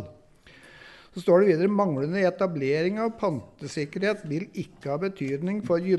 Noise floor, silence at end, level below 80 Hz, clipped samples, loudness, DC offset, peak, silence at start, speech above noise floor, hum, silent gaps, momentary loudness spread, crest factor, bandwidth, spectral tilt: -53 dBFS; 0 s; -64 dBFS; under 0.1%; -26 LUFS; under 0.1%; -8 dBFS; 0 s; 28 dB; none; none; 14 LU; 18 dB; 12 kHz; -7 dB/octave